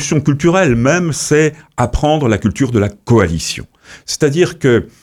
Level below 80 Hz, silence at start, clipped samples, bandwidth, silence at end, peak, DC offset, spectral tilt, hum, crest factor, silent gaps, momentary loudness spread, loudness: -30 dBFS; 0 s; under 0.1%; 16 kHz; 0.15 s; 0 dBFS; under 0.1%; -5.5 dB/octave; none; 14 dB; none; 8 LU; -14 LUFS